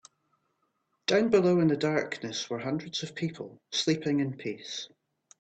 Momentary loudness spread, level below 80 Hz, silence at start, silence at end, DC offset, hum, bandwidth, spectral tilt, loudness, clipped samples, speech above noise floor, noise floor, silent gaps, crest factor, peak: 14 LU; -70 dBFS; 1.1 s; 0.55 s; under 0.1%; none; 8.8 kHz; -5 dB/octave; -29 LUFS; under 0.1%; 48 dB; -77 dBFS; none; 18 dB; -12 dBFS